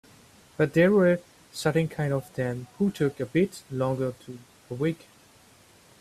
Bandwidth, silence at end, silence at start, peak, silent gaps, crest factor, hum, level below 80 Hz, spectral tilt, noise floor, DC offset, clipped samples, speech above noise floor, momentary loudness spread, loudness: 14.5 kHz; 1.05 s; 0.6 s; -10 dBFS; none; 18 dB; none; -62 dBFS; -7 dB/octave; -56 dBFS; under 0.1%; under 0.1%; 31 dB; 20 LU; -26 LUFS